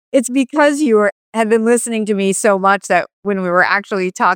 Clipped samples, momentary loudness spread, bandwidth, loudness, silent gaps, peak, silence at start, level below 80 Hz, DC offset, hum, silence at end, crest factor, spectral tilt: under 0.1%; 5 LU; 18 kHz; -15 LUFS; 1.12-1.32 s, 3.13-3.23 s; 0 dBFS; 0.15 s; -68 dBFS; under 0.1%; none; 0 s; 14 dB; -4.5 dB/octave